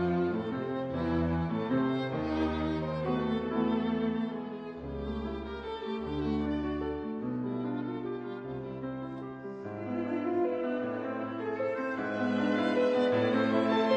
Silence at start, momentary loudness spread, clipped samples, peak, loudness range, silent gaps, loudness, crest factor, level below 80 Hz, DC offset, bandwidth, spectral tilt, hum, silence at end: 0 s; 11 LU; under 0.1%; -16 dBFS; 5 LU; none; -32 LUFS; 16 dB; -50 dBFS; under 0.1%; 8.2 kHz; -8 dB/octave; none; 0 s